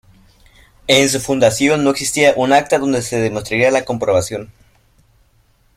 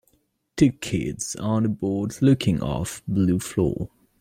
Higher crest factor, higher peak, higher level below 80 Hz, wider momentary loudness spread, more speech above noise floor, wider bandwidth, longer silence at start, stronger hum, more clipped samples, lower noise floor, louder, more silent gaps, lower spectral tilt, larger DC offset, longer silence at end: about the same, 16 dB vs 18 dB; first, 0 dBFS vs -6 dBFS; about the same, -48 dBFS vs -46 dBFS; about the same, 7 LU vs 9 LU; about the same, 41 dB vs 44 dB; about the same, 16 kHz vs 16 kHz; first, 0.85 s vs 0.55 s; neither; neither; second, -55 dBFS vs -67 dBFS; first, -15 LUFS vs -24 LUFS; neither; second, -3.5 dB/octave vs -6 dB/octave; neither; first, 1.3 s vs 0.35 s